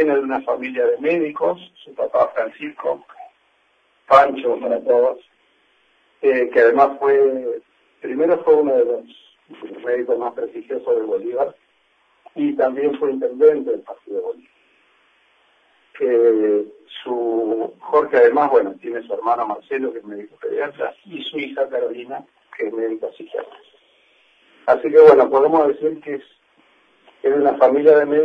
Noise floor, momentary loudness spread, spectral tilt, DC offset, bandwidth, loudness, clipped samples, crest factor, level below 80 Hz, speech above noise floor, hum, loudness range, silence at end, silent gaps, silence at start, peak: -61 dBFS; 17 LU; -7 dB/octave; under 0.1%; 5.2 kHz; -18 LUFS; under 0.1%; 18 dB; -66 dBFS; 44 dB; none; 9 LU; 0 s; none; 0 s; 0 dBFS